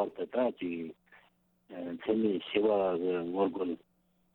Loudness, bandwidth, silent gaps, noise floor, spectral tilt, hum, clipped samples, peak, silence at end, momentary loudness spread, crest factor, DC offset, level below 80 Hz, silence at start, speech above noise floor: -32 LUFS; 4.2 kHz; none; -69 dBFS; -9 dB/octave; none; under 0.1%; -14 dBFS; 0.6 s; 14 LU; 18 dB; under 0.1%; -72 dBFS; 0 s; 37 dB